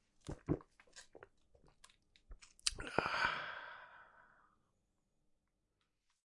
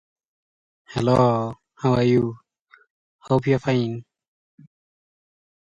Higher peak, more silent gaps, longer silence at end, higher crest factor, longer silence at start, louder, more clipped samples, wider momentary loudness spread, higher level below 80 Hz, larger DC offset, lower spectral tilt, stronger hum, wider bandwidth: second, -12 dBFS vs -6 dBFS; second, none vs 2.60-2.65 s, 2.90-3.19 s; first, 2 s vs 1.6 s; first, 36 dB vs 18 dB; second, 0.25 s vs 0.9 s; second, -41 LUFS vs -22 LUFS; neither; first, 25 LU vs 12 LU; second, -62 dBFS vs -52 dBFS; neither; second, -3 dB/octave vs -8 dB/octave; neither; first, 11.5 kHz vs 9.8 kHz